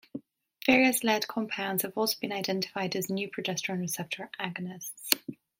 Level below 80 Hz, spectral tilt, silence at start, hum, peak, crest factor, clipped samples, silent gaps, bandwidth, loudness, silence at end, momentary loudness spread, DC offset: -72 dBFS; -3.5 dB/octave; 0.15 s; none; 0 dBFS; 30 dB; under 0.1%; none; 16.5 kHz; -29 LUFS; 0.25 s; 13 LU; under 0.1%